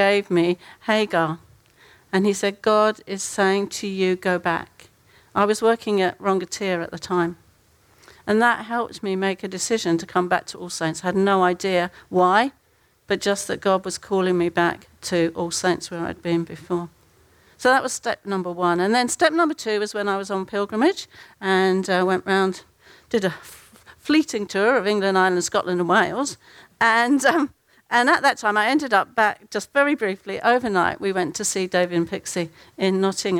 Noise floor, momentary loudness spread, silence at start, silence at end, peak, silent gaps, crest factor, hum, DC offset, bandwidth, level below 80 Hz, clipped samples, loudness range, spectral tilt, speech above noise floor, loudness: -61 dBFS; 9 LU; 0 s; 0 s; -4 dBFS; none; 18 dB; none; under 0.1%; 16.5 kHz; -60 dBFS; under 0.1%; 4 LU; -4 dB/octave; 40 dB; -21 LUFS